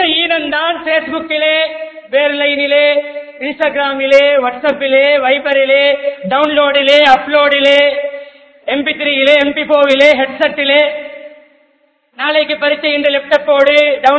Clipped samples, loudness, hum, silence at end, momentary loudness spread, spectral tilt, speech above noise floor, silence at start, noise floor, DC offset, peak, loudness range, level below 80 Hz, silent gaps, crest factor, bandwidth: 0.4%; -11 LUFS; none; 0 s; 9 LU; -3.5 dB/octave; 45 dB; 0 s; -56 dBFS; under 0.1%; 0 dBFS; 3 LU; -54 dBFS; none; 12 dB; 8 kHz